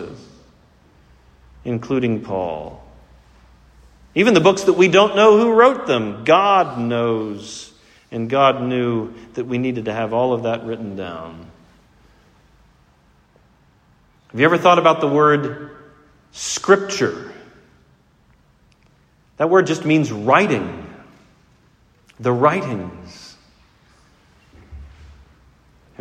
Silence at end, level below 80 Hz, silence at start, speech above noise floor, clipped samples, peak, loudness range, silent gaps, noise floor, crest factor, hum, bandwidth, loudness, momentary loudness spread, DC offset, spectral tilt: 0.95 s; -52 dBFS; 0 s; 39 dB; under 0.1%; 0 dBFS; 12 LU; none; -56 dBFS; 20 dB; none; 10 kHz; -17 LUFS; 21 LU; under 0.1%; -5 dB/octave